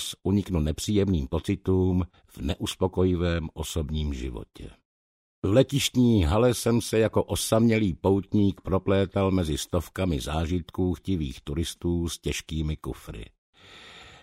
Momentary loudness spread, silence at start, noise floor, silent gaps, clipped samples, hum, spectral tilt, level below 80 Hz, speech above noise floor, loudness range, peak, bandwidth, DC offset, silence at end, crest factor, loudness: 13 LU; 0 s; -48 dBFS; 4.85-5.42 s, 13.38-13.53 s; under 0.1%; none; -6 dB/octave; -40 dBFS; 23 dB; 7 LU; -6 dBFS; 16 kHz; under 0.1%; 0.1 s; 20 dB; -26 LUFS